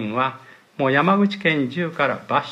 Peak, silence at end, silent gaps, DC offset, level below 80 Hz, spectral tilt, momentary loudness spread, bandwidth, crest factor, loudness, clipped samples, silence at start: -4 dBFS; 0 s; none; under 0.1%; -70 dBFS; -7 dB/octave; 8 LU; 8 kHz; 16 dB; -20 LUFS; under 0.1%; 0 s